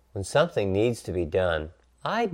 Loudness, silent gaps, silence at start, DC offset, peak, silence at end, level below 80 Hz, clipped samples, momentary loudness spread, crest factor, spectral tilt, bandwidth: -27 LUFS; none; 0.15 s; under 0.1%; -8 dBFS; 0 s; -48 dBFS; under 0.1%; 8 LU; 18 dB; -5.5 dB/octave; 16 kHz